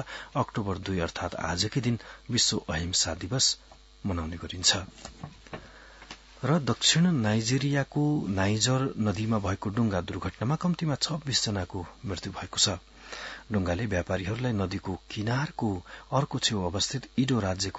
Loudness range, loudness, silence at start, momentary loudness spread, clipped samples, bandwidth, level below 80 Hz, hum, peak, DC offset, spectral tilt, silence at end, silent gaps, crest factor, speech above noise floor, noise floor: 4 LU; -28 LUFS; 0 s; 13 LU; under 0.1%; 8.2 kHz; -54 dBFS; none; -8 dBFS; under 0.1%; -4 dB/octave; 0 s; none; 20 dB; 21 dB; -50 dBFS